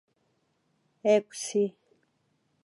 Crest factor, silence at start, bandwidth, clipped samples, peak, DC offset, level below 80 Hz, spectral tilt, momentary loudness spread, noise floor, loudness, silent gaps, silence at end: 20 dB; 1.05 s; 11.5 kHz; under 0.1%; -12 dBFS; under 0.1%; under -90 dBFS; -4.5 dB/octave; 7 LU; -73 dBFS; -28 LUFS; none; 0.95 s